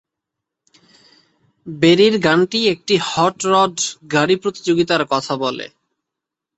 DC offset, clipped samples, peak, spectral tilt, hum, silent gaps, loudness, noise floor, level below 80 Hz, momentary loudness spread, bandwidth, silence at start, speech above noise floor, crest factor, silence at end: under 0.1%; under 0.1%; 0 dBFS; -4 dB/octave; none; none; -16 LUFS; -83 dBFS; -58 dBFS; 9 LU; 8.4 kHz; 1.65 s; 67 dB; 18 dB; 0.9 s